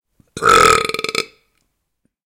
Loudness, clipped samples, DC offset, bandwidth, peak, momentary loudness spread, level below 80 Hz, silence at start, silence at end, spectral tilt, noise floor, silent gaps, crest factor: -14 LUFS; under 0.1%; under 0.1%; 17.5 kHz; 0 dBFS; 13 LU; -44 dBFS; 0.35 s; 1.05 s; -2 dB/octave; -70 dBFS; none; 18 dB